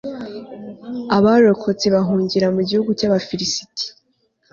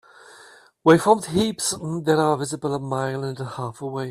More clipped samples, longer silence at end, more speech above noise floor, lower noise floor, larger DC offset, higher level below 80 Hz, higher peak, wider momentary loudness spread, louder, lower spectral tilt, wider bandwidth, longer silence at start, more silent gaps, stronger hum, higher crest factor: neither; first, 0.65 s vs 0 s; first, 47 dB vs 28 dB; first, -64 dBFS vs -50 dBFS; neither; about the same, -54 dBFS vs -56 dBFS; about the same, -2 dBFS vs -2 dBFS; first, 18 LU vs 13 LU; first, -17 LUFS vs -22 LUFS; about the same, -5.5 dB/octave vs -5 dB/octave; second, 7.4 kHz vs 15 kHz; second, 0.05 s vs 0.85 s; neither; neither; about the same, 16 dB vs 20 dB